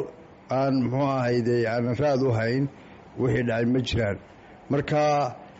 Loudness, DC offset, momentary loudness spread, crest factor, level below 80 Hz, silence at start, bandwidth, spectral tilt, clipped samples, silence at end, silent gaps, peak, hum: -25 LUFS; under 0.1%; 7 LU; 12 dB; -50 dBFS; 0 s; 8 kHz; -6 dB/octave; under 0.1%; 0 s; none; -14 dBFS; none